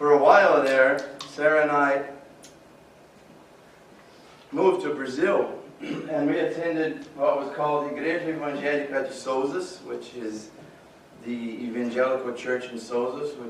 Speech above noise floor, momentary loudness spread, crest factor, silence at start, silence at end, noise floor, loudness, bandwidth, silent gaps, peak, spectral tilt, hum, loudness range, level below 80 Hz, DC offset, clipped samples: 26 dB; 16 LU; 22 dB; 0 s; 0 s; -52 dBFS; -25 LUFS; 12.5 kHz; none; -4 dBFS; -5 dB/octave; none; 6 LU; -70 dBFS; under 0.1%; under 0.1%